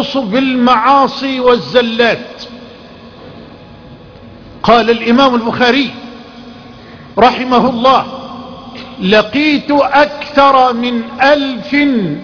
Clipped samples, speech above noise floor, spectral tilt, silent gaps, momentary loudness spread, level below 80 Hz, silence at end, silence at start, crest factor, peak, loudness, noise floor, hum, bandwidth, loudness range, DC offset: 0.2%; 24 dB; -5.5 dB/octave; none; 19 LU; -44 dBFS; 0 s; 0 s; 12 dB; 0 dBFS; -11 LUFS; -35 dBFS; none; 5.4 kHz; 5 LU; under 0.1%